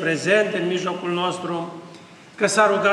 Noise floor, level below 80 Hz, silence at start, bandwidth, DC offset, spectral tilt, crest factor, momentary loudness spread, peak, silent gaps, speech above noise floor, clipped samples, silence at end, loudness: -44 dBFS; -76 dBFS; 0 s; 13 kHz; under 0.1%; -4 dB/octave; 16 dB; 12 LU; -6 dBFS; none; 23 dB; under 0.1%; 0 s; -21 LUFS